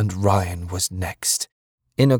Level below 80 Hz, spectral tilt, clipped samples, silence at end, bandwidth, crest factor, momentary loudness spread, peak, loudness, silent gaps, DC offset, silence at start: -46 dBFS; -4.5 dB/octave; under 0.1%; 0 s; 19.5 kHz; 18 dB; 9 LU; -4 dBFS; -22 LUFS; 1.52-1.78 s; under 0.1%; 0 s